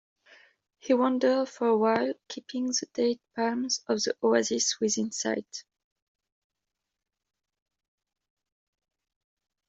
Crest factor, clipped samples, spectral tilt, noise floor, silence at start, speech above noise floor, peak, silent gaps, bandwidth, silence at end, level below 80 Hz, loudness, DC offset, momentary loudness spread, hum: 20 dB; under 0.1%; -2.5 dB/octave; -86 dBFS; 0.85 s; 59 dB; -10 dBFS; none; 8.2 kHz; 4.05 s; -76 dBFS; -27 LUFS; under 0.1%; 10 LU; none